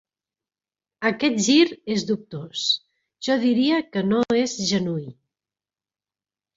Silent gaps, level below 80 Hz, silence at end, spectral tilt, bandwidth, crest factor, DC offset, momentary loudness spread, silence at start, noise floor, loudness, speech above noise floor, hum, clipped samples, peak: none; -64 dBFS; 1.45 s; -4 dB/octave; 7.8 kHz; 18 dB; under 0.1%; 11 LU; 1 s; under -90 dBFS; -22 LUFS; over 68 dB; none; under 0.1%; -4 dBFS